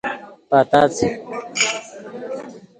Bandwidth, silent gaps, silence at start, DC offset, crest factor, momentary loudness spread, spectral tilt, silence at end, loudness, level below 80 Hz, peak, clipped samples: 9.8 kHz; none; 0.05 s; under 0.1%; 20 dB; 18 LU; -3.5 dB/octave; 0.2 s; -19 LUFS; -54 dBFS; 0 dBFS; under 0.1%